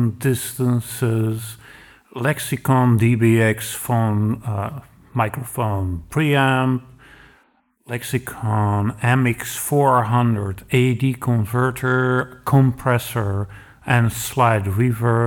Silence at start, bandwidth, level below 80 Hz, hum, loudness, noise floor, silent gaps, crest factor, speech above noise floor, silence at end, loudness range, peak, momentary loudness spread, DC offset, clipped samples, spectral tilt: 0 s; 19 kHz; -48 dBFS; none; -20 LUFS; -60 dBFS; none; 16 dB; 41 dB; 0 s; 3 LU; -2 dBFS; 10 LU; under 0.1%; under 0.1%; -6.5 dB/octave